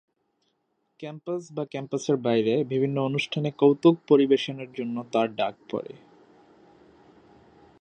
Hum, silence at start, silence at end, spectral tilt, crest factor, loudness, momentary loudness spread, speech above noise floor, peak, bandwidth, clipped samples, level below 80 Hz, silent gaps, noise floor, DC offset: none; 1 s; 1.9 s; -6.5 dB/octave; 20 dB; -25 LUFS; 15 LU; 50 dB; -6 dBFS; 9 kHz; under 0.1%; -74 dBFS; none; -74 dBFS; under 0.1%